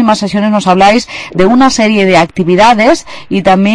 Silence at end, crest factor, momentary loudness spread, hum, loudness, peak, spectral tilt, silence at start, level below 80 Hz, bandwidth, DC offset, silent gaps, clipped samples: 0 s; 8 dB; 6 LU; none; -8 LUFS; 0 dBFS; -5 dB/octave; 0 s; -36 dBFS; 10.5 kHz; under 0.1%; none; 0.5%